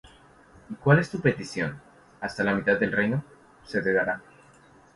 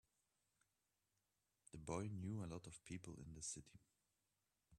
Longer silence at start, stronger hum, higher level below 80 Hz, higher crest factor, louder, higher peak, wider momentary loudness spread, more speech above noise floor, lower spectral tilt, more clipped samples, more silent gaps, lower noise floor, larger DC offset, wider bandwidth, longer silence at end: second, 0.7 s vs 1.75 s; neither; first, -58 dBFS vs -74 dBFS; about the same, 22 dB vs 24 dB; first, -26 LUFS vs -52 LUFS; first, -4 dBFS vs -32 dBFS; first, 14 LU vs 9 LU; second, 30 dB vs 38 dB; first, -7 dB/octave vs -5 dB/octave; neither; neither; second, -55 dBFS vs -90 dBFS; neither; second, 11.5 kHz vs 13 kHz; first, 0.75 s vs 0 s